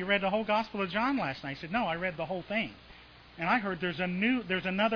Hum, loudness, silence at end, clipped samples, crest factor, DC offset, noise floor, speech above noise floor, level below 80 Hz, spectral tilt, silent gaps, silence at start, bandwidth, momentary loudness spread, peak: none; -31 LUFS; 0 s; under 0.1%; 18 dB; under 0.1%; -53 dBFS; 22 dB; -60 dBFS; -7 dB/octave; none; 0 s; 5.4 kHz; 7 LU; -14 dBFS